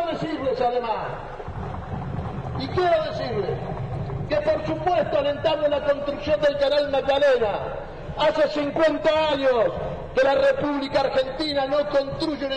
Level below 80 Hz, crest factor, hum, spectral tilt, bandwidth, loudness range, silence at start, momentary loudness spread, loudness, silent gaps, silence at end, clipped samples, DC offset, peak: -42 dBFS; 14 dB; none; -6.5 dB/octave; 9.2 kHz; 5 LU; 0 s; 11 LU; -23 LUFS; none; 0 s; under 0.1%; under 0.1%; -10 dBFS